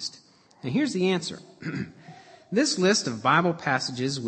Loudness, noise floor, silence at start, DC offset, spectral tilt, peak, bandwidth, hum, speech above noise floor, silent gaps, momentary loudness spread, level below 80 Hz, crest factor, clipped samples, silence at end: -25 LUFS; -54 dBFS; 0 s; under 0.1%; -4 dB/octave; -6 dBFS; 8.8 kHz; none; 29 dB; none; 14 LU; -70 dBFS; 20 dB; under 0.1%; 0 s